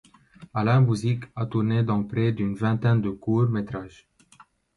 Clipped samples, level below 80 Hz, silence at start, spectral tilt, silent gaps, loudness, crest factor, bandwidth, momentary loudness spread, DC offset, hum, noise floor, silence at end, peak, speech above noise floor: under 0.1%; -54 dBFS; 0.4 s; -8.5 dB/octave; none; -24 LUFS; 14 dB; 11 kHz; 10 LU; under 0.1%; none; -56 dBFS; 0.9 s; -10 dBFS; 33 dB